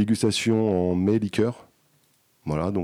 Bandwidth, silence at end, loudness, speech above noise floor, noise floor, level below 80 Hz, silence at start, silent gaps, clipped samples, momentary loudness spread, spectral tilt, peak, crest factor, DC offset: 14.5 kHz; 0 s; -24 LUFS; 41 dB; -64 dBFS; -52 dBFS; 0 s; none; under 0.1%; 9 LU; -6 dB/octave; -10 dBFS; 14 dB; under 0.1%